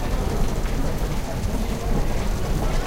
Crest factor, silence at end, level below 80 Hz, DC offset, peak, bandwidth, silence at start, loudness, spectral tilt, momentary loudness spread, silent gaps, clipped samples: 12 dB; 0 s; -24 dBFS; under 0.1%; -10 dBFS; 16 kHz; 0 s; -26 LUFS; -6 dB/octave; 2 LU; none; under 0.1%